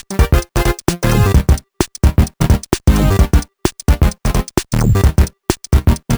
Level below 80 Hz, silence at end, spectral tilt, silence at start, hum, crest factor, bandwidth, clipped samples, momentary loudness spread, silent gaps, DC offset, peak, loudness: -16 dBFS; 0 s; -6 dB/octave; 0.1 s; none; 14 dB; over 20 kHz; under 0.1%; 6 LU; none; under 0.1%; 0 dBFS; -15 LUFS